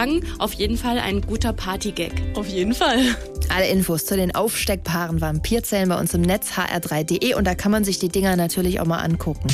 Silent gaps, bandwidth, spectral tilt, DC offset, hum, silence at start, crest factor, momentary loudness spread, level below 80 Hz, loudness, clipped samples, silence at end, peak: none; 16 kHz; -4.5 dB/octave; under 0.1%; none; 0 s; 12 dB; 6 LU; -32 dBFS; -21 LUFS; under 0.1%; 0 s; -8 dBFS